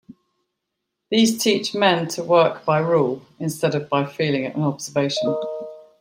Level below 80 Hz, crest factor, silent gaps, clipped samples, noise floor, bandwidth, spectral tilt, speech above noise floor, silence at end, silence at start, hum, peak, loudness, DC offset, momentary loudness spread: -66 dBFS; 18 dB; none; under 0.1%; -79 dBFS; 16 kHz; -4.5 dB/octave; 59 dB; 0.2 s; 0.1 s; none; -4 dBFS; -21 LUFS; under 0.1%; 10 LU